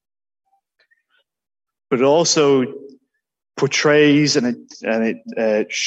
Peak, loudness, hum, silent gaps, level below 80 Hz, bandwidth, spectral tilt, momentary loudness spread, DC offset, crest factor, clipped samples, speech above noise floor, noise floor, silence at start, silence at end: -4 dBFS; -17 LUFS; none; none; -68 dBFS; 8.4 kHz; -4 dB/octave; 13 LU; under 0.1%; 16 dB; under 0.1%; 50 dB; -66 dBFS; 1.9 s; 0 s